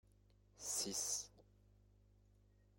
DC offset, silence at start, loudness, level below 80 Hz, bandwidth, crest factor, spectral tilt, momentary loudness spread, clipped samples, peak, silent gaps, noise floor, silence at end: under 0.1%; 0.55 s; -42 LUFS; -72 dBFS; 16.5 kHz; 20 dB; -1 dB/octave; 11 LU; under 0.1%; -30 dBFS; none; -71 dBFS; 1.35 s